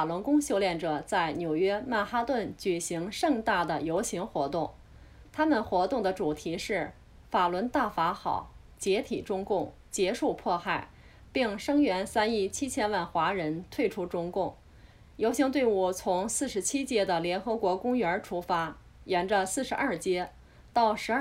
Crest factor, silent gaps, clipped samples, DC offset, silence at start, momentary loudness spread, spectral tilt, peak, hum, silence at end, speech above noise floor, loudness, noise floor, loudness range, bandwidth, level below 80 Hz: 18 dB; none; under 0.1%; under 0.1%; 0 s; 7 LU; -4 dB/octave; -12 dBFS; none; 0 s; 25 dB; -30 LUFS; -54 dBFS; 2 LU; 16 kHz; -56 dBFS